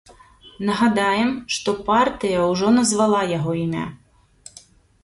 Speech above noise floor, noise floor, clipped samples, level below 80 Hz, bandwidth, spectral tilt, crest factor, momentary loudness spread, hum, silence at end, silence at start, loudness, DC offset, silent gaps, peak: 30 dB; -49 dBFS; under 0.1%; -52 dBFS; 11.5 kHz; -4.5 dB/octave; 16 dB; 8 LU; none; 1.05 s; 0.45 s; -20 LUFS; under 0.1%; none; -6 dBFS